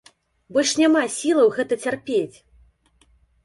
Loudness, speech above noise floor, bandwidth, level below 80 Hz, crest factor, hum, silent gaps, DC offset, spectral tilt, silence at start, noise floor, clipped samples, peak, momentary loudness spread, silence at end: -20 LUFS; 40 dB; 11.5 kHz; -62 dBFS; 16 dB; none; none; under 0.1%; -3 dB/octave; 0.5 s; -60 dBFS; under 0.1%; -6 dBFS; 7 LU; 1.15 s